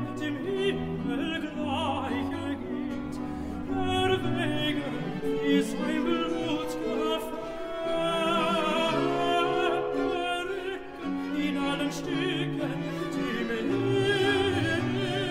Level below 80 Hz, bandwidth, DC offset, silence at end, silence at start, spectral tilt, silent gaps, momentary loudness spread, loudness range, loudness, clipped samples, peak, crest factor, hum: -50 dBFS; 16 kHz; under 0.1%; 0 s; 0 s; -5.5 dB/octave; none; 8 LU; 3 LU; -29 LUFS; under 0.1%; -12 dBFS; 16 dB; none